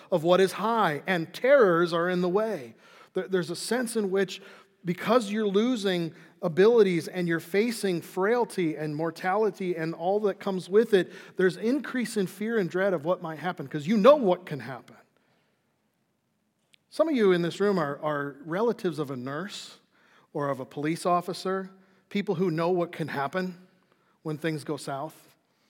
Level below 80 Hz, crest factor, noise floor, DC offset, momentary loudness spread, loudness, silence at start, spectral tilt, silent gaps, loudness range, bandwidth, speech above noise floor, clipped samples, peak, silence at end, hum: -90 dBFS; 22 dB; -74 dBFS; under 0.1%; 13 LU; -27 LUFS; 0.1 s; -6 dB/octave; none; 6 LU; 17 kHz; 48 dB; under 0.1%; -4 dBFS; 0.6 s; none